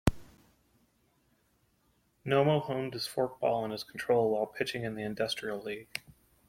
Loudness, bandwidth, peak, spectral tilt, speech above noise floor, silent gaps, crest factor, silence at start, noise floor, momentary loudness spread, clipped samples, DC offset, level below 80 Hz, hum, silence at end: -32 LUFS; 16.5 kHz; -8 dBFS; -5.5 dB/octave; 40 dB; none; 26 dB; 0.05 s; -72 dBFS; 11 LU; under 0.1%; under 0.1%; -52 dBFS; none; 0.4 s